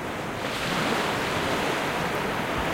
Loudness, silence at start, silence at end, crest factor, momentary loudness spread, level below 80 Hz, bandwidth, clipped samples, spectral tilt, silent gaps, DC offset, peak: -26 LUFS; 0 s; 0 s; 14 dB; 4 LU; -46 dBFS; 16 kHz; under 0.1%; -4 dB/octave; none; under 0.1%; -14 dBFS